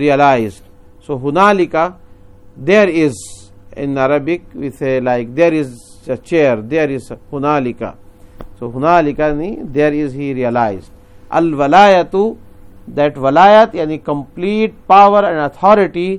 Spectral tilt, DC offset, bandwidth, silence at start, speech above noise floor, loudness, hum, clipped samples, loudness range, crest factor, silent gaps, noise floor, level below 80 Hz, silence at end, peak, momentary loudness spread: -6.5 dB/octave; under 0.1%; 12 kHz; 0 s; 27 dB; -13 LUFS; none; 0.1%; 5 LU; 14 dB; none; -39 dBFS; -42 dBFS; 0 s; 0 dBFS; 17 LU